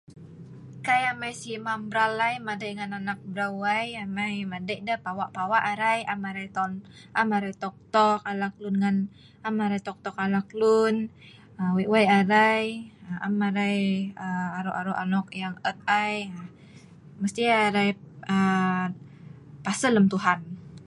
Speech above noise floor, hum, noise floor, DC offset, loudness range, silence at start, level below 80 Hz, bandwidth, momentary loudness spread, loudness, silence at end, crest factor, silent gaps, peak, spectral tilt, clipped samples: 24 dB; none; -49 dBFS; under 0.1%; 5 LU; 0.1 s; -66 dBFS; 11.5 kHz; 13 LU; -26 LUFS; 0.05 s; 20 dB; none; -6 dBFS; -5.5 dB/octave; under 0.1%